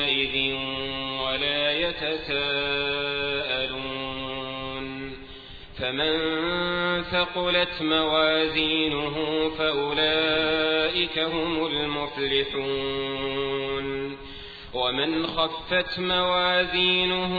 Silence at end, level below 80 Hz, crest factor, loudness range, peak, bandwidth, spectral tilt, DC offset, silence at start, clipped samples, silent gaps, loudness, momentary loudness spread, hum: 0 s; -48 dBFS; 18 dB; 5 LU; -8 dBFS; 4.9 kHz; -6.5 dB/octave; 0.1%; 0 s; under 0.1%; none; -25 LUFS; 10 LU; none